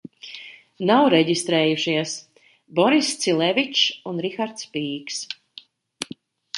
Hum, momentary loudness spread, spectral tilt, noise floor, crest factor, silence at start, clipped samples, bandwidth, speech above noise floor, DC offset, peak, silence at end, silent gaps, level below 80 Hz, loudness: none; 17 LU; -3.5 dB/octave; -48 dBFS; 20 dB; 0.25 s; under 0.1%; 11.5 kHz; 27 dB; under 0.1%; -4 dBFS; 0 s; none; -72 dBFS; -21 LUFS